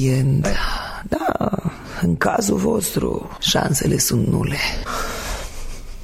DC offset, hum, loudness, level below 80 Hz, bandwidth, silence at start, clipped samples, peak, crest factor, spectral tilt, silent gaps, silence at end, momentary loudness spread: under 0.1%; none; -20 LUFS; -32 dBFS; 16 kHz; 0 s; under 0.1%; -4 dBFS; 16 dB; -4.5 dB/octave; none; 0 s; 11 LU